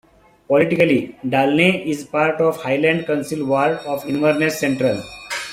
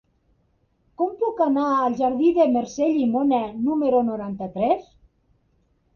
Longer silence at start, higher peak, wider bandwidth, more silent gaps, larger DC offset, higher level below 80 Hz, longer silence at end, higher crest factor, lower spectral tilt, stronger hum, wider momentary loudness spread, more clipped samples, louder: second, 0.5 s vs 1 s; first, -2 dBFS vs -8 dBFS; first, 16 kHz vs 7 kHz; neither; neither; about the same, -58 dBFS vs -58 dBFS; second, 0 s vs 1.15 s; about the same, 18 dB vs 16 dB; second, -5.5 dB/octave vs -7 dB/octave; neither; about the same, 8 LU vs 7 LU; neither; first, -18 LUFS vs -22 LUFS